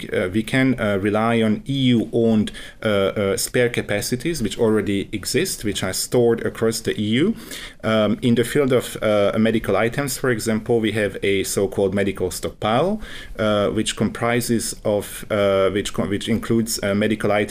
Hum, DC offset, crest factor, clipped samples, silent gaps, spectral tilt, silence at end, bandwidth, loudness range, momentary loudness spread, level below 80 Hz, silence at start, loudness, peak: none; under 0.1%; 14 dB; under 0.1%; none; -5 dB/octave; 0 s; 16 kHz; 2 LU; 5 LU; -44 dBFS; 0 s; -20 LUFS; -6 dBFS